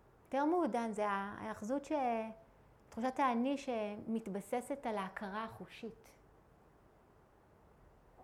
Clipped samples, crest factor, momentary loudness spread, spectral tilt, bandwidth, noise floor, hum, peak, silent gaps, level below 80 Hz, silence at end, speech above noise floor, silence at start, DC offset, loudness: under 0.1%; 18 dB; 14 LU; -5.5 dB/octave; 15 kHz; -66 dBFS; none; -22 dBFS; none; -72 dBFS; 0 s; 28 dB; 0.3 s; under 0.1%; -39 LUFS